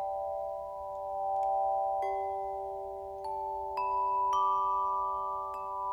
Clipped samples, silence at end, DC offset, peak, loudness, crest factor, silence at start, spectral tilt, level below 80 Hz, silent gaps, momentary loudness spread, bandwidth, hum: under 0.1%; 0 s; under 0.1%; -20 dBFS; -33 LUFS; 14 dB; 0 s; -5 dB/octave; -62 dBFS; none; 10 LU; 13 kHz; none